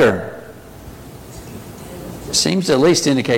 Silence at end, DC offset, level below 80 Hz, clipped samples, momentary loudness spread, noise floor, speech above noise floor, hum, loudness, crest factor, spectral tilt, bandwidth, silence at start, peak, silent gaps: 0 s; under 0.1%; -44 dBFS; under 0.1%; 23 LU; -37 dBFS; 22 dB; none; -15 LUFS; 16 dB; -4 dB/octave; 17 kHz; 0 s; -2 dBFS; none